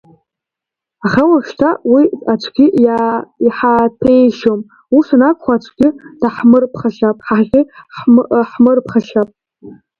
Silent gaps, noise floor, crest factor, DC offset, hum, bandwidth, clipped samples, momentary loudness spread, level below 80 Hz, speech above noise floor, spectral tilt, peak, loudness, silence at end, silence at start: none; -84 dBFS; 12 dB; under 0.1%; none; 6.8 kHz; under 0.1%; 8 LU; -50 dBFS; 72 dB; -8 dB/octave; 0 dBFS; -12 LUFS; 0.25 s; 1.05 s